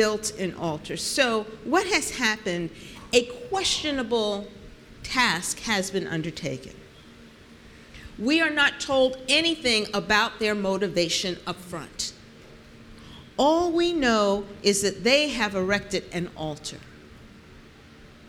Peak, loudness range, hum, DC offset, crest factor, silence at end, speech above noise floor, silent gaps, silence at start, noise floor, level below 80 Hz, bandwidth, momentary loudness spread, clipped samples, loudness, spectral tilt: -6 dBFS; 5 LU; none; under 0.1%; 22 dB; 0 s; 24 dB; none; 0 s; -49 dBFS; -52 dBFS; 18.5 kHz; 15 LU; under 0.1%; -24 LUFS; -3 dB/octave